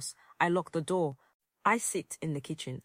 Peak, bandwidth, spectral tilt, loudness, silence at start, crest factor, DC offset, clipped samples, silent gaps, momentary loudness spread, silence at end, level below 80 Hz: -12 dBFS; 16 kHz; -4.5 dB/octave; -32 LUFS; 0 s; 22 dB; under 0.1%; under 0.1%; 1.34-1.40 s; 9 LU; 0.05 s; -74 dBFS